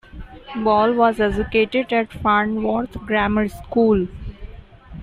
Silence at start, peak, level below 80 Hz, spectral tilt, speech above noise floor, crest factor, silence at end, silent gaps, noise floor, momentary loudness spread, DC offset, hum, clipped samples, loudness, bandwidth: 0.15 s; -4 dBFS; -38 dBFS; -7 dB/octave; 21 dB; 16 dB; 0 s; none; -39 dBFS; 12 LU; under 0.1%; none; under 0.1%; -19 LUFS; 14 kHz